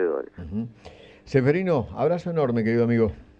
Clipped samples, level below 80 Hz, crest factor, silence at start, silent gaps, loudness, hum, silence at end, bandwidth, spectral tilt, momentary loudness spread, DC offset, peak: under 0.1%; -50 dBFS; 16 dB; 0 s; none; -24 LUFS; none; 0.15 s; 7.8 kHz; -9 dB/octave; 11 LU; under 0.1%; -8 dBFS